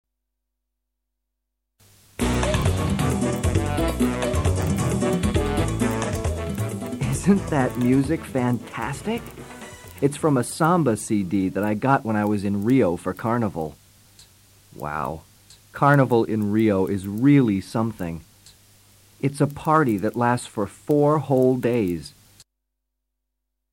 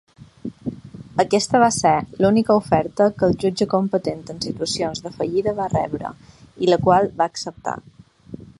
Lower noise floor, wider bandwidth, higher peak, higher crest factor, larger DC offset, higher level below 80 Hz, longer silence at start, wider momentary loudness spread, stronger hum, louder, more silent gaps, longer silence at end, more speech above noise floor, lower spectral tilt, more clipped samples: first, -80 dBFS vs -40 dBFS; first, 16.5 kHz vs 11.5 kHz; about the same, -4 dBFS vs -2 dBFS; about the same, 20 dB vs 18 dB; neither; first, -38 dBFS vs -50 dBFS; first, 2.2 s vs 0.2 s; second, 11 LU vs 16 LU; neither; about the same, -22 LUFS vs -20 LUFS; neither; first, 1.65 s vs 0.25 s; first, 59 dB vs 20 dB; first, -6.5 dB/octave vs -5 dB/octave; neither